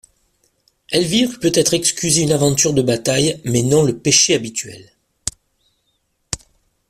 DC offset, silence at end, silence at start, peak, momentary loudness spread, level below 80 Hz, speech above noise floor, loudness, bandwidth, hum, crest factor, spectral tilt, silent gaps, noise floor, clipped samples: under 0.1%; 0.55 s; 0.9 s; 0 dBFS; 15 LU; -48 dBFS; 51 dB; -16 LUFS; 15 kHz; none; 18 dB; -3.5 dB/octave; none; -67 dBFS; under 0.1%